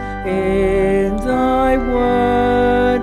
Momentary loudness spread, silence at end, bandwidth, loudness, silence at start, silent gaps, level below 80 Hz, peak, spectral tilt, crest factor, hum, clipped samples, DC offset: 3 LU; 0 s; 13.5 kHz; -16 LUFS; 0 s; none; -28 dBFS; -4 dBFS; -7 dB/octave; 10 dB; none; under 0.1%; under 0.1%